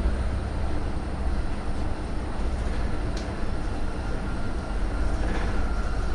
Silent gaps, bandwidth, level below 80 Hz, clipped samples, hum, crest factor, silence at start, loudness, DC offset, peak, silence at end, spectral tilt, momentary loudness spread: none; 10.5 kHz; -28 dBFS; under 0.1%; none; 12 dB; 0 s; -31 LUFS; under 0.1%; -14 dBFS; 0 s; -6.5 dB/octave; 3 LU